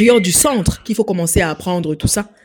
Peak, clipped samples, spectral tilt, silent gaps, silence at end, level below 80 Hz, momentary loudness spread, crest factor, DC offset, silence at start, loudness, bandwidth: 0 dBFS; under 0.1%; -4 dB/octave; none; 0.2 s; -32 dBFS; 9 LU; 16 dB; under 0.1%; 0 s; -15 LUFS; 17.5 kHz